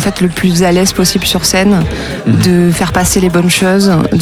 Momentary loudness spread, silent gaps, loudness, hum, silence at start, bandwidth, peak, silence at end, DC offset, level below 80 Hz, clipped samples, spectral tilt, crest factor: 4 LU; none; -10 LUFS; none; 0 s; 18 kHz; 0 dBFS; 0 s; under 0.1%; -28 dBFS; under 0.1%; -4.5 dB/octave; 10 dB